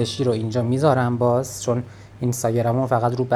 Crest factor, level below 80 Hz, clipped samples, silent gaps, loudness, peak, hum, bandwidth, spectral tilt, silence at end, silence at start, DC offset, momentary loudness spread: 18 dB; -54 dBFS; under 0.1%; none; -21 LUFS; -4 dBFS; none; 14 kHz; -6.5 dB/octave; 0 s; 0 s; under 0.1%; 7 LU